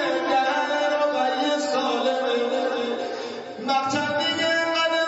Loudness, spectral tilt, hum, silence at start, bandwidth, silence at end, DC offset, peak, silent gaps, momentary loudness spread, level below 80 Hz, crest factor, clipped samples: -23 LUFS; -3 dB/octave; none; 0 s; 8 kHz; 0 s; under 0.1%; -10 dBFS; none; 7 LU; -74 dBFS; 12 dB; under 0.1%